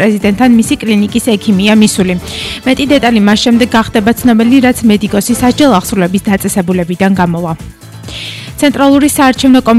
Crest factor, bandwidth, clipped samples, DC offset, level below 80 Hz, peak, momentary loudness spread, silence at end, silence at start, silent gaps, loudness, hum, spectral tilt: 8 dB; 15 kHz; 0.2%; under 0.1%; -34 dBFS; 0 dBFS; 11 LU; 0 s; 0 s; none; -9 LUFS; none; -5 dB/octave